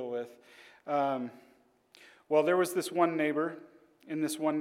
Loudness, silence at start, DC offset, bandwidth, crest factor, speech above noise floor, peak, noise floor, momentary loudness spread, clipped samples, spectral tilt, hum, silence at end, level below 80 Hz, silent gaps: -31 LUFS; 0 s; under 0.1%; 16.5 kHz; 20 dB; 33 dB; -12 dBFS; -63 dBFS; 15 LU; under 0.1%; -5 dB/octave; none; 0 s; -90 dBFS; none